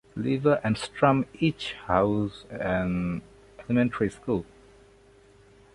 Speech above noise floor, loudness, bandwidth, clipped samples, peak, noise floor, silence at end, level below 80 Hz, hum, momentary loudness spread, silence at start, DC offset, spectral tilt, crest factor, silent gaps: 30 dB; -27 LUFS; 11.5 kHz; under 0.1%; -6 dBFS; -56 dBFS; 1.3 s; -50 dBFS; none; 10 LU; 0.15 s; under 0.1%; -7 dB/octave; 22 dB; none